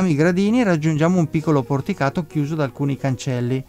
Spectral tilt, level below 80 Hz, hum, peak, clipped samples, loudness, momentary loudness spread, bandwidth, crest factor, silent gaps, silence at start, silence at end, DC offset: -7.5 dB/octave; -50 dBFS; none; -6 dBFS; under 0.1%; -20 LUFS; 6 LU; 15 kHz; 14 dB; none; 0 s; 0.05 s; under 0.1%